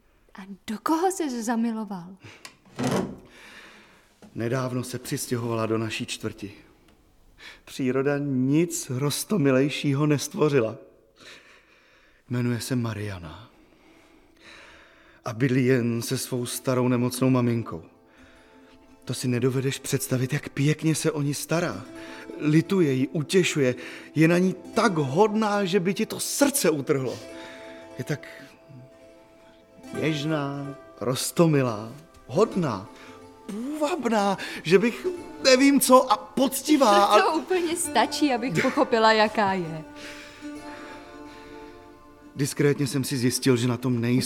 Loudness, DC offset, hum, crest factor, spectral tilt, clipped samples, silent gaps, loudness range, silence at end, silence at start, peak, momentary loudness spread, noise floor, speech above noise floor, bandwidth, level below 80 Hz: -24 LUFS; under 0.1%; none; 22 dB; -5 dB/octave; under 0.1%; none; 11 LU; 0 s; 0.35 s; -4 dBFS; 20 LU; -58 dBFS; 34 dB; 18 kHz; -60 dBFS